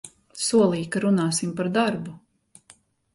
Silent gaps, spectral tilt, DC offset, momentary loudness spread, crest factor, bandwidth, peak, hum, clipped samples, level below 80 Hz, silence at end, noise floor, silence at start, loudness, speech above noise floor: none; -5 dB/octave; under 0.1%; 13 LU; 16 dB; 11.5 kHz; -8 dBFS; none; under 0.1%; -64 dBFS; 0.95 s; -57 dBFS; 0.05 s; -23 LUFS; 34 dB